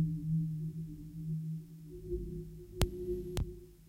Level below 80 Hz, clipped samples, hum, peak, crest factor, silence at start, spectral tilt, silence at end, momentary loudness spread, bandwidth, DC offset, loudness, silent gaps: -46 dBFS; under 0.1%; none; -8 dBFS; 32 dB; 0 s; -7 dB/octave; 0 s; 11 LU; 16 kHz; under 0.1%; -40 LUFS; none